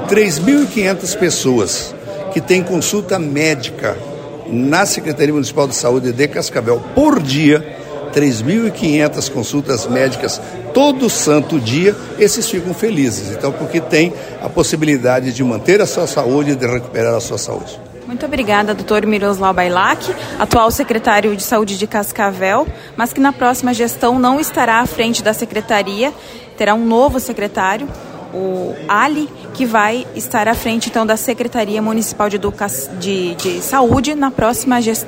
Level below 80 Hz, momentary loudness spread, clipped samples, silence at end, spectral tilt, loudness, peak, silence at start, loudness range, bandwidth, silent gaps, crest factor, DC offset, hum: -40 dBFS; 8 LU; under 0.1%; 0 s; -4.5 dB/octave; -15 LUFS; 0 dBFS; 0 s; 2 LU; 16.5 kHz; none; 14 dB; under 0.1%; none